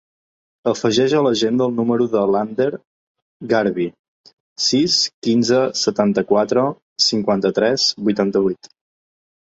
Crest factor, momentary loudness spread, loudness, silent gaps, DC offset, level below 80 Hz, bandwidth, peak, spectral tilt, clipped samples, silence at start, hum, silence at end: 16 dB; 7 LU; -18 LUFS; 2.85-3.15 s, 3.22-3.40 s, 3.99-4.24 s, 4.33-4.56 s, 5.14-5.22 s, 6.82-6.96 s; under 0.1%; -60 dBFS; 8 kHz; -2 dBFS; -4 dB/octave; under 0.1%; 0.65 s; none; 0.9 s